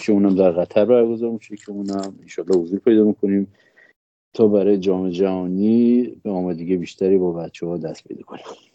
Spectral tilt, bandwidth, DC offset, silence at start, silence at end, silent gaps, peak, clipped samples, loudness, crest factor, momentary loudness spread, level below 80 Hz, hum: -8 dB/octave; 8.2 kHz; under 0.1%; 0 s; 0.2 s; 3.96-4.32 s; -2 dBFS; under 0.1%; -19 LUFS; 18 dB; 16 LU; -68 dBFS; none